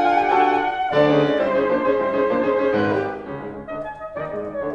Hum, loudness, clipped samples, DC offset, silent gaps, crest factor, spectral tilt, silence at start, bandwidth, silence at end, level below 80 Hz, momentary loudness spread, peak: none; -20 LUFS; under 0.1%; under 0.1%; none; 16 dB; -7 dB/octave; 0 s; 7.6 kHz; 0 s; -52 dBFS; 14 LU; -4 dBFS